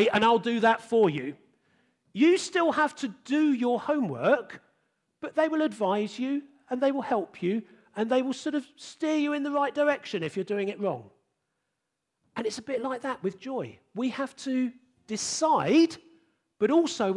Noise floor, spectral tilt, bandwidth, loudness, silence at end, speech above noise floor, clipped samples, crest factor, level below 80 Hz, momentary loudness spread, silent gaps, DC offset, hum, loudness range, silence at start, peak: -83 dBFS; -4.5 dB/octave; 11.5 kHz; -27 LUFS; 0 s; 56 dB; under 0.1%; 18 dB; -76 dBFS; 12 LU; none; under 0.1%; none; 7 LU; 0 s; -10 dBFS